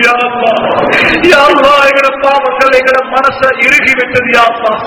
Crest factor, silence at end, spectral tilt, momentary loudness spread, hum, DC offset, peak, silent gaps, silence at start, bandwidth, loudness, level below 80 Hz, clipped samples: 8 dB; 0 s; -3.5 dB/octave; 5 LU; none; under 0.1%; 0 dBFS; none; 0 s; 19.5 kHz; -7 LUFS; -40 dBFS; 4%